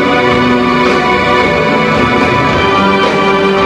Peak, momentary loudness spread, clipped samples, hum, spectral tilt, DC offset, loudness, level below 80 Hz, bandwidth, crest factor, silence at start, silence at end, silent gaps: 0 dBFS; 1 LU; 0.1%; none; -5.5 dB/octave; 0.1%; -9 LUFS; -32 dBFS; 12.5 kHz; 10 dB; 0 s; 0 s; none